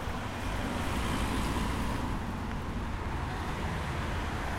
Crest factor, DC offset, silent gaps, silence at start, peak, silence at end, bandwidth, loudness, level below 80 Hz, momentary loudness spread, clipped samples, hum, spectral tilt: 14 dB; under 0.1%; none; 0 s; -20 dBFS; 0 s; 16 kHz; -34 LUFS; -38 dBFS; 5 LU; under 0.1%; none; -5.5 dB/octave